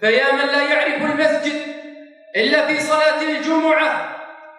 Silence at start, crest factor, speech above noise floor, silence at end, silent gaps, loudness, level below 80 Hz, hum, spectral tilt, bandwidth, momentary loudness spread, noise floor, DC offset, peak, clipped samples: 0 s; 16 dB; 23 dB; 0.05 s; none; -17 LUFS; -74 dBFS; none; -3 dB/octave; 11.5 kHz; 12 LU; -39 dBFS; under 0.1%; -2 dBFS; under 0.1%